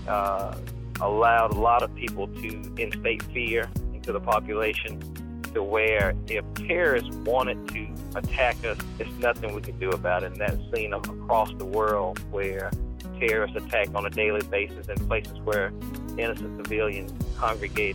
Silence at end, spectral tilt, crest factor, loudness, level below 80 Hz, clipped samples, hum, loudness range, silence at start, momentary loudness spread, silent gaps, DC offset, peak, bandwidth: 0 s; -5.5 dB/octave; 18 dB; -27 LUFS; -38 dBFS; under 0.1%; none; 3 LU; 0 s; 11 LU; none; under 0.1%; -10 dBFS; 17.5 kHz